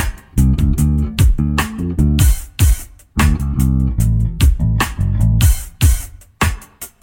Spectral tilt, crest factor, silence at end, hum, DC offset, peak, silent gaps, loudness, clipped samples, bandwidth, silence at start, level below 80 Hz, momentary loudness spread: -5.5 dB/octave; 12 dB; 0.15 s; none; under 0.1%; -2 dBFS; none; -16 LUFS; under 0.1%; 17.5 kHz; 0 s; -18 dBFS; 7 LU